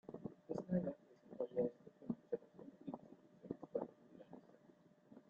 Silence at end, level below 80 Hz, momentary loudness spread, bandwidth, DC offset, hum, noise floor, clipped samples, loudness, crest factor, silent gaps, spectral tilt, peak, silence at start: 0.1 s; -80 dBFS; 20 LU; 7.2 kHz; under 0.1%; none; -69 dBFS; under 0.1%; -47 LUFS; 20 dB; none; -10 dB/octave; -28 dBFS; 0.1 s